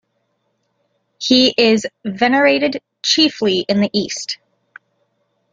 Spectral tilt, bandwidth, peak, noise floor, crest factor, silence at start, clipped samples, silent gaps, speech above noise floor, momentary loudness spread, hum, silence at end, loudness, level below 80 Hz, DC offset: -3.5 dB/octave; 9.2 kHz; 0 dBFS; -68 dBFS; 18 dB; 1.2 s; under 0.1%; none; 52 dB; 12 LU; none; 1.2 s; -15 LUFS; -60 dBFS; under 0.1%